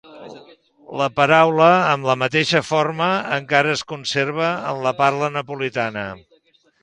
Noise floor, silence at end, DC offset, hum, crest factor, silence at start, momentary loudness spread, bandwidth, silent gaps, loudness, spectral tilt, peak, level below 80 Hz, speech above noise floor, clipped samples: -58 dBFS; 0.65 s; under 0.1%; none; 20 dB; 0.1 s; 11 LU; 10.5 kHz; none; -18 LUFS; -5 dB/octave; 0 dBFS; -60 dBFS; 39 dB; under 0.1%